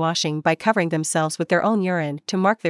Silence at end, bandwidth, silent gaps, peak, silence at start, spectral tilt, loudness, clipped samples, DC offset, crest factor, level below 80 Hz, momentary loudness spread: 0 s; 12 kHz; none; -4 dBFS; 0 s; -4.5 dB/octave; -21 LUFS; under 0.1%; under 0.1%; 16 dB; -72 dBFS; 4 LU